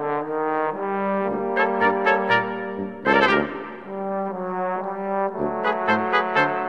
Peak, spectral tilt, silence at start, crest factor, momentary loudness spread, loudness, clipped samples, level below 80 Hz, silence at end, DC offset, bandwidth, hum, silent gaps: -4 dBFS; -6.5 dB/octave; 0 s; 20 dB; 10 LU; -22 LUFS; under 0.1%; -60 dBFS; 0 s; 0.3%; 8.4 kHz; none; none